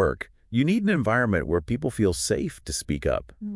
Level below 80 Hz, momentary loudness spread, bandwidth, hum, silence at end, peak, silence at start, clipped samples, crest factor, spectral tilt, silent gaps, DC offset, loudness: -42 dBFS; 7 LU; 12 kHz; none; 0 s; -10 dBFS; 0 s; under 0.1%; 16 dB; -5.5 dB/octave; none; under 0.1%; -25 LUFS